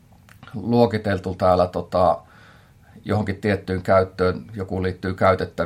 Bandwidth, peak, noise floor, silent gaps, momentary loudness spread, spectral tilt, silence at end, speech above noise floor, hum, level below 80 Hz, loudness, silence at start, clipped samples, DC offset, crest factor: 14 kHz; -2 dBFS; -50 dBFS; none; 10 LU; -8 dB/octave; 0 s; 29 dB; none; -54 dBFS; -21 LUFS; 0.4 s; under 0.1%; under 0.1%; 20 dB